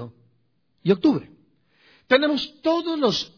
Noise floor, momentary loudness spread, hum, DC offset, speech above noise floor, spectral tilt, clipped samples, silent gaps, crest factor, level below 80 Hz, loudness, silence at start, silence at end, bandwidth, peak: -69 dBFS; 9 LU; none; under 0.1%; 47 dB; -5.5 dB/octave; under 0.1%; none; 20 dB; -62 dBFS; -22 LUFS; 0 s; 0.1 s; 5.4 kHz; -4 dBFS